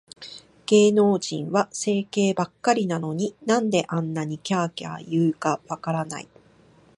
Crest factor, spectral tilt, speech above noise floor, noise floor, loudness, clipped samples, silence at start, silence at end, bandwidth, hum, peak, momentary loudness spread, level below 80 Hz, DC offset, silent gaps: 18 dB; -5.5 dB/octave; 32 dB; -55 dBFS; -23 LUFS; under 0.1%; 0.2 s; 0.75 s; 11.5 kHz; none; -6 dBFS; 15 LU; -68 dBFS; under 0.1%; none